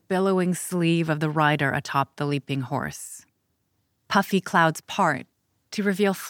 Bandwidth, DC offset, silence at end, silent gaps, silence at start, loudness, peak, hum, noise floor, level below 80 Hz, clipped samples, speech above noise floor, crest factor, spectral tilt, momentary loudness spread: 18 kHz; under 0.1%; 0 s; none; 0.1 s; -24 LUFS; -4 dBFS; none; -73 dBFS; -68 dBFS; under 0.1%; 49 dB; 20 dB; -5.5 dB/octave; 11 LU